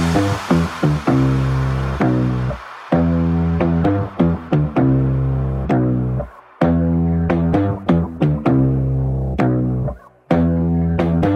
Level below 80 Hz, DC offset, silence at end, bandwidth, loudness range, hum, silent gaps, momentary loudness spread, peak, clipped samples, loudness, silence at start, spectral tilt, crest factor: -30 dBFS; under 0.1%; 0 s; 10.5 kHz; 1 LU; none; none; 5 LU; -2 dBFS; under 0.1%; -18 LUFS; 0 s; -8.5 dB/octave; 16 dB